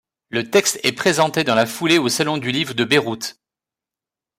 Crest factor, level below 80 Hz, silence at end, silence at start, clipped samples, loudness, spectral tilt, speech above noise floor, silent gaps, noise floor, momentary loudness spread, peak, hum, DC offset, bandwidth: 16 dB; -62 dBFS; 1.05 s; 0.3 s; under 0.1%; -18 LUFS; -3.5 dB/octave; 70 dB; none; -89 dBFS; 10 LU; -4 dBFS; none; under 0.1%; 16 kHz